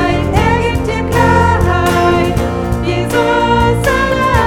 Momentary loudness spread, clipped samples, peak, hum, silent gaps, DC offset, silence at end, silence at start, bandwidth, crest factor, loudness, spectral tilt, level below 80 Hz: 5 LU; under 0.1%; 0 dBFS; none; none; under 0.1%; 0 s; 0 s; 17 kHz; 12 dB; -12 LUFS; -6 dB/octave; -22 dBFS